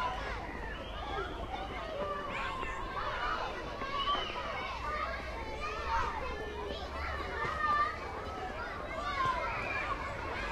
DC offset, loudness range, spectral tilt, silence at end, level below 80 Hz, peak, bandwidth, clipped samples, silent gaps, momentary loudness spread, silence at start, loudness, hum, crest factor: under 0.1%; 3 LU; -4.5 dB/octave; 0 s; -46 dBFS; -20 dBFS; 13 kHz; under 0.1%; none; 7 LU; 0 s; -36 LUFS; none; 16 dB